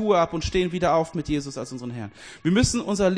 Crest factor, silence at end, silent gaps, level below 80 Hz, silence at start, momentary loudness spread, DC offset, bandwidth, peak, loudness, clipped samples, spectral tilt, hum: 16 dB; 0 s; none; -40 dBFS; 0 s; 13 LU; under 0.1%; 10.5 kHz; -6 dBFS; -24 LUFS; under 0.1%; -5 dB/octave; none